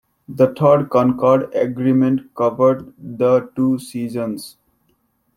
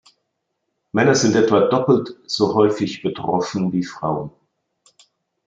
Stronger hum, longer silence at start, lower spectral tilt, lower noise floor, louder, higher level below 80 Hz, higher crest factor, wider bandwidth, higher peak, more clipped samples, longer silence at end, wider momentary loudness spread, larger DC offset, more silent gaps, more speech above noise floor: neither; second, 0.3 s vs 0.95 s; first, -8 dB/octave vs -5 dB/octave; second, -64 dBFS vs -75 dBFS; about the same, -17 LUFS vs -19 LUFS; about the same, -60 dBFS vs -60 dBFS; about the same, 16 dB vs 18 dB; first, 15.5 kHz vs 9 kHz; about the same, -2 dBFS vs -2 dBFS; neither; second, 0.9 s vs 1.2 s; about the same, 12 LU vs 10 LU; neither; neither; second, 47 dB vs 57 dB